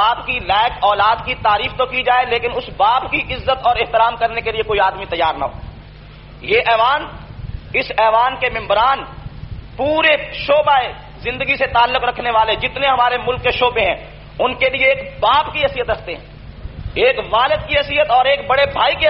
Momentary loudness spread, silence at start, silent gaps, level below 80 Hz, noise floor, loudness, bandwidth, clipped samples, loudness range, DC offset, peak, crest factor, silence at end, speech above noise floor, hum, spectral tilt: 13 LU; 0 s; none; -36 dBFS; -37 dBFS; -16 LUFS; 5.8 kHz; under 0.1%; 2 LU; under 0.1%; -2 dBFS; 14 dB; 0 s; 21 dB; none; -1 dB/octave